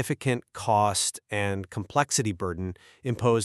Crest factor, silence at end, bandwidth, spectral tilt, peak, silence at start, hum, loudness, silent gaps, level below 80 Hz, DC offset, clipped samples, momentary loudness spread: 20 dB; 0 s; 13.5 kHz; -4 dB/octave; -8 dBFS; 0 s; none; -27 LUFS; none; -58 dBFS; under 0.1%; under 0.1%; 10 LU